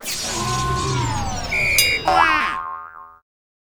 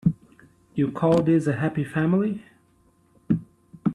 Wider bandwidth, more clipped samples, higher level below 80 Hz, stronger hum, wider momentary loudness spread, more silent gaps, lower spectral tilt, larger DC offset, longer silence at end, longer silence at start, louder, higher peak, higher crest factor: first, over 20 kHz vs 11 kHz; neither; first, -36 dBFS vs -56 dBFS; neither; first, 14 LU vs 11 LU; neither; second, -2.5 dB/octave vs -9 dB/octave; neither; first, 0.45 s vs 0 s; about the same, 0 s vs 0.05 s; first, -19 LUFS vs -24 LUFS; first, 0 dBFS vs -8 dBFS; about the same, 20 dB vs 18 dB